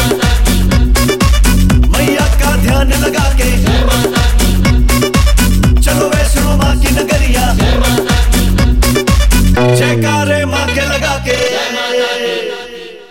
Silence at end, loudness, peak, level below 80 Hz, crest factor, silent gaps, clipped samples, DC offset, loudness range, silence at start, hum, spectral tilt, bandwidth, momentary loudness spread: 0.05 s; -11 LUFS; -2 dBFS; -12 dBFS; 8 dB; none; under 0.1%; under 0.1%; 1 LU; 0 s; none; -5 dB/octave; 16.5 kHz; 4 LU